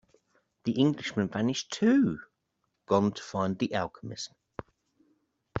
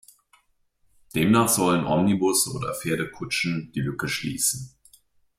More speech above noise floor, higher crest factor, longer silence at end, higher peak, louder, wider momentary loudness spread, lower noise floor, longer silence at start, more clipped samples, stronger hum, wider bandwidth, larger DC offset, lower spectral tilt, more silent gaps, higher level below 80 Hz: first, 51 dB vs 43 dB; about the same, 20 dB vs 18 dB; second, 0 s vs 0.7 s; about the same, -10 dBFS vs -8 dBFS; second, -29 LUFS vs -23 LUFS; first, 15 LU vs 10 LU; first, -79 dBFS vs -66 dBFS; second, 0.65 s vs 1.15 s; neither; neither; second, 8 kHz vs 16 kHz; neither; first, -5.5 dB/octave vs -4 dB/octave; neither; second, -64 dBFS vs -56 dBFS